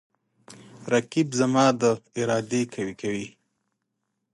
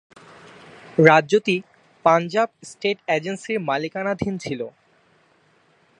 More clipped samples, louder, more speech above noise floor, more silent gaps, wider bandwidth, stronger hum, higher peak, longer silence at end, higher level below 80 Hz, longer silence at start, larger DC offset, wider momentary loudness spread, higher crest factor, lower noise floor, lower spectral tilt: neither; second, -25 LUFS vs -21 LUFS; first, 55 dB vs 39 dB; neither; about the same, 11.5 kHz vs 10.5 kHz; neither; second, -6 dBFS vs 0 dBFS; second, 1.05 s vs 1.3 s; second, -68 dBFS vs -60 dBFS; second, 0.5 s vs 1 s; neither; about the same, 11 LU vs 13 LU; about the same, 20 dB vs 22 dB; first, -79 dBFS vs -60 dBFS; about the same, -5 dB/octave vs -5.5 dB/octave